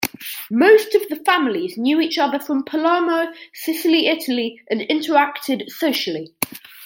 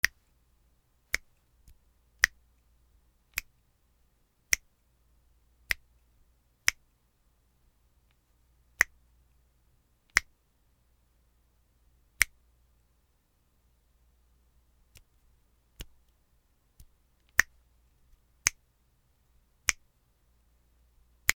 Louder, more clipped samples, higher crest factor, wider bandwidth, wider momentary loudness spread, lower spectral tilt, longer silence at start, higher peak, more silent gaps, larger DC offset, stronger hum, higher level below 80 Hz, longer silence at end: first, -19 LUFS vs -30 LUFS; neither; second, 20 dB vs 38 dB; second, 17 kHz vs over 20 kHz; second, 11 LU vs 15 LU; first, -3.5 dB/octave vs 1 dB/octave; about the same, 0 s vs 0.05 s; about the same, 0 dBFS vs 0 dBFS; neither; neither; neither; second, -68 dBFS vs -58 dBFS; about the same, 0 s vs 0.05 s